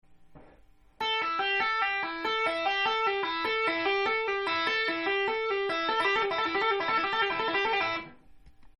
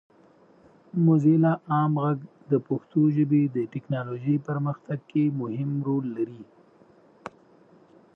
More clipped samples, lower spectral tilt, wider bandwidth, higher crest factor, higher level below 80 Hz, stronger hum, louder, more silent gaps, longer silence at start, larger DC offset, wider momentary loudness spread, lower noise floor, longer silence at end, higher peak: neither; second, -3 dB/octave vs -11 dB/octave; first, 11.5 kHz vs 3.8 kHz; about the same, 16 dB vs 16 dB; first, -62 dBFS vs -74 dBFS; neither; second, -28 LUFS vs -25 LUFS; neither; second, 0.1 s vs 0.95 s; neither; second, 3 LU vs 13 LU; about the same, -58 dBFS vs -57 dBFS; second, 0.15 s vs 1.7 s; second, -14 dBFS vs -10 dBFS